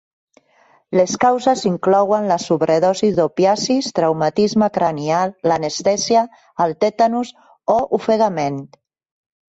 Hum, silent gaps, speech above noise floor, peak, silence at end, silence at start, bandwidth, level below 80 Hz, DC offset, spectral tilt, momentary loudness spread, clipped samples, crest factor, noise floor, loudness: none; none; 39 dB; -4 dBFS; 0.9 s; 0.9 s; 8 kHz; -58 dBFS; under 0.1%; -5 dB/octave; 6 LU; under 0.1%; 14 dB; -55 dBFS; -17 LUFS